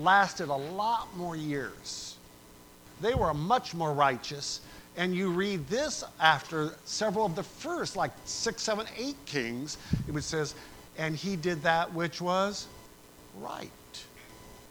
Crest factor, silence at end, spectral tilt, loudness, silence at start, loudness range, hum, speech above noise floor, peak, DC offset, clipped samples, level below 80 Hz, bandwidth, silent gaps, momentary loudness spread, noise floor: 26 dB; 0 s; -4 dB/octave; -31 LUFS; 0 s; 4 LU; none; 23 dB; -6 dBFS; under 0.1%; under 0.1%; -54 dBFS; over 20 kHz; none; 17 LU; -54 dBFS